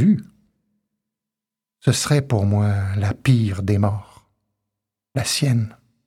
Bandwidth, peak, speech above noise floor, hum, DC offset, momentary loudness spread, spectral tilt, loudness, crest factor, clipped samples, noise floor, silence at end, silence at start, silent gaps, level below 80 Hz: 15 kHz; -4 dBFS; 69 dB; none; under 0.1%; 6 LU; -5.5 dB/octave; -20 LUFS; 18 dB; under 0.1%; -88 dBFS; 0.35 s; 0 s; none; -52 dBFS